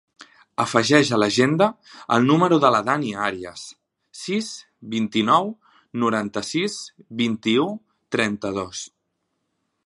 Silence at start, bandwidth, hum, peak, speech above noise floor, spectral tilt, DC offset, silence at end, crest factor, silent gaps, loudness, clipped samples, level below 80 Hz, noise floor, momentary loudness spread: 0.2 s; 11.5 kHz; none; 0 dBFS; 54 dB; -5 dB/octave; under 0.1%; 1 s; 22 dB; none; -21 LUFS; under 0.1%; -62 dBFS; -75 dBFS; 17 LU